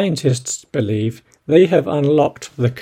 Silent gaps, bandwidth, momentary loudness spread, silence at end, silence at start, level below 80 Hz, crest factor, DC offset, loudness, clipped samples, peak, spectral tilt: none; 15.5 kHz; 9 LU; 0 s; 0 s; -56 dBFS; 16 dB; under 0.1%; -17 LUFS; under 0.1%; 0 dBFS; -6 dB/octave